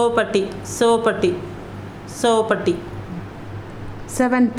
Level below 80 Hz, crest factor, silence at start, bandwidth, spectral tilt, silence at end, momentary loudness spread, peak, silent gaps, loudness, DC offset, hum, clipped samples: -46 dBFS; 16 dB; 0 s; 15 kHz; -5 dB/octave; 0 s; 17 LU; -4 dBFS; none; -20 LUFS; under 0.1%; none; under 0.1%